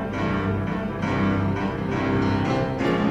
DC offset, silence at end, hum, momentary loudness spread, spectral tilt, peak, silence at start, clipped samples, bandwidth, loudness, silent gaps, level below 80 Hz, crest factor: under 0.1%; 0 s; none; 4 LU; -7.5 dB/octave; -10 dBFS; 0 s; under 0.1%; 8.6 kHz; -24 LUFS; none; -42 dBFS; 12 dB